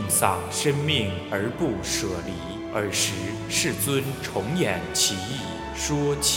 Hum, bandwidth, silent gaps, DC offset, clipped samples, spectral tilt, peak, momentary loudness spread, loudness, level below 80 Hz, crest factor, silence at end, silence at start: none; 17 kHz; none; under 0.1%; under 0.1%; -3.5 dB/octave; -4 dBFS; 9 LU; -25 LUFS; -46 dBFS; 22 dB; 0 s; 0 s